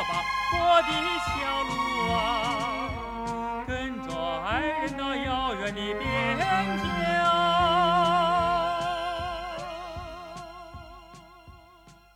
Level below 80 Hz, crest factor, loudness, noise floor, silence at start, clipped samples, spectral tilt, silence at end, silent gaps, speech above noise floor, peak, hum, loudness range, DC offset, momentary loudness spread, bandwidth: -46 dBFS; 18 dB; -26 LUFS; -54 dBFS; 0 s; under 0.1%; -4.5 dB/octave; 0.25 s; none; 27 dB; -10 dBFS; none; 6 LU; under 0.1%; 16 LU; 16 kHz